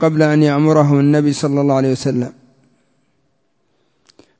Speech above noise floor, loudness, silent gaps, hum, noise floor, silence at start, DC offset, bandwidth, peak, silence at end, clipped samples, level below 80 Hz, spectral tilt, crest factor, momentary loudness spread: 52 dB; -14 LUFS; none; none; -65 dBFS; 0 s; under 0.1%; 8 kHz; 0 dBFS; 2.1 s; under 0.1%; -58 dBFS; -7.5 dB/octave; 16 dB; 8 LU